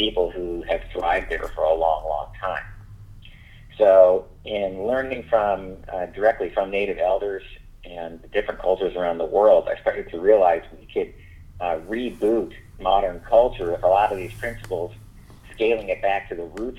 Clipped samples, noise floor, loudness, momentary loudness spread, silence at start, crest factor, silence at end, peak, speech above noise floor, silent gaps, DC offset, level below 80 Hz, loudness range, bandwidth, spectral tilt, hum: under 0.1%; -45 dBFS; -22 LUFS; 14 LU; 0 s; 20 dB; 0 s; -2 dBFS; 23 dB; none; under 0.1%; -42 dBFS; 4 LU; 12 kHz; -6 dB/octave; none